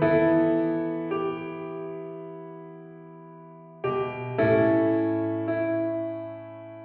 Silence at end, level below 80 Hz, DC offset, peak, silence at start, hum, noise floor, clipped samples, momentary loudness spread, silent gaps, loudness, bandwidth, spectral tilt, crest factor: 0 s; -62 dBFS; under 0.1%; -10 dBFS; 0 s; none; -46 dBFS; under 0.1%; 24 LU; none; -26 LUFS; 4.3 kHz; -11 dB/octave; 16 dB